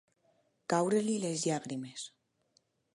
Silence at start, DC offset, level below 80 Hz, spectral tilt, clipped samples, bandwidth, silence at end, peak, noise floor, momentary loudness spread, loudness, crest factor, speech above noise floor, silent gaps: 0.7 s; under 0.1%; -82 dBFS; -4.5 dB/octave; under 0.1%; 11.5 kHz; 0.85 s; -16 dBFS; -74 dBFS; 16 LU; -33 LUFS; 20 dB; 42 dB; none